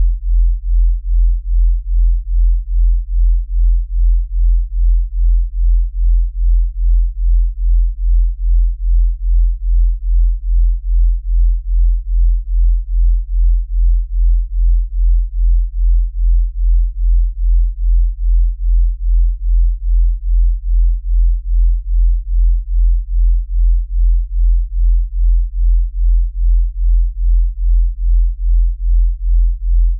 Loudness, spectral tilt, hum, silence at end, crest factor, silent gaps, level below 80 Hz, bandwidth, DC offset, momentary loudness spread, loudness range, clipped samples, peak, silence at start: -18 LUFS; -15 dB/octave; none; 0 s; 6 dB; none; -12 dBFS; 0.2 kHz; under 0.1%; 0 LU; 0 LU; under 0.1%; -6 dBFS; 0 s